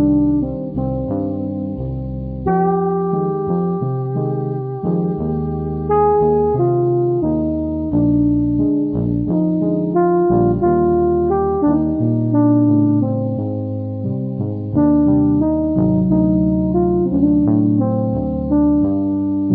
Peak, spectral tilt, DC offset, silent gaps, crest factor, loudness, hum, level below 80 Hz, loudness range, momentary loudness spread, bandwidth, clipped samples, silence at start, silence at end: -4 dBFS; -15.5 dB/octave; under 0.1%; none; 12 dB; -17 LUFS; none; -34 dBFS; 4 LU; 8 LU; 2.4 kHz; under 0.1%; 0 s; 0 s